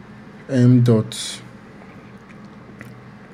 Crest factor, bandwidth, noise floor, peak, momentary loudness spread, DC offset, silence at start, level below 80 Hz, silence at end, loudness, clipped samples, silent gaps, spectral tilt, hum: 18 dB; 12.5 kHz; -41 dBFS; -4 dBFS; 27 LU; under 0.1%; 0.1 s; -58 dBFS; 0.4 s; -17 LUFS; under 0.1%; none; -7 dB/octave; none